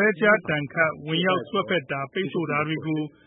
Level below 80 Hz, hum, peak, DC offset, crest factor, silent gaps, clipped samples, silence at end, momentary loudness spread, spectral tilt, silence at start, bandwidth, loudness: -66 dBFS; none; -6 dBFS; under 0.1%; 18 dB; none; under 0.1%; 0.2 s; 8 LU; -10 dB/octave; 0 s; 4 kHz; -24 LUFS